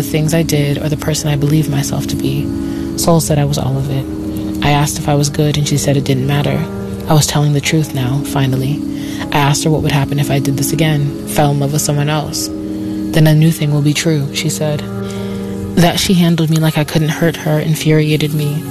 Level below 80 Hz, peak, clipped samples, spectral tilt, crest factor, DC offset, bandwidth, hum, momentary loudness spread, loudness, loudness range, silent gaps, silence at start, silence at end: -36 dBFS; 0 dBFS; under 0.1%; -5.5 dB/octave; 14 dB; under 0.1%; 14 kHz; none; 8 LU; -14 LUFS; 1 LU; none; 0 s; 0 s